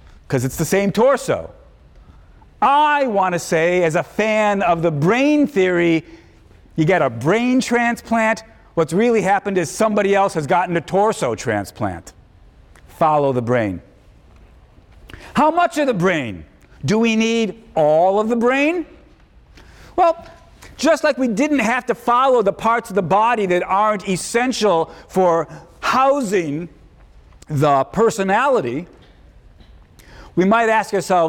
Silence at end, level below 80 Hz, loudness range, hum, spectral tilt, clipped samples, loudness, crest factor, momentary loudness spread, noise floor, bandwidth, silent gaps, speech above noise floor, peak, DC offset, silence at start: 0 s; -48 dBFS; 3 LU; none; -5.5 dB/octave; under 0.1%; -17 LUFS; 12 dB; 9 LU; -48 dBFS; 17.5 kHz; none; 31 dB; -6 dBFS; under 0.1%; 0.3 s